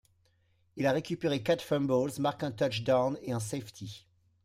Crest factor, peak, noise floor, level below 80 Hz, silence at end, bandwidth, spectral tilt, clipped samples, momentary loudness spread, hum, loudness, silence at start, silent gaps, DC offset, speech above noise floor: 18 dB; -14 dBFS; -70 dBFS; -66 dBFS; 0.45 s; 16 kHz; -5.5 dB/octave; under 0.1%; 16 LU; none; -31 LUFS; 0.75 s; none; under 0.1%; 39 dB